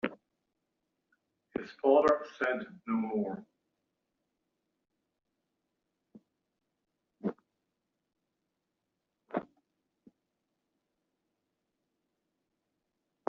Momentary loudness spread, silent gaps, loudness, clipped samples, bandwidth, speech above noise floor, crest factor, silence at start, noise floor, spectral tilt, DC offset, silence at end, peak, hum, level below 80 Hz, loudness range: 16 LU; none; -32 LUFS; under 0.1%; 7.2 kHz; 55 dB; 26 dB; 0.05 s; -85 dBFS; -5 dB/octave; under 0.1%; 3.85 s; -12 dBFS; none; -76 dBFS; 17 LU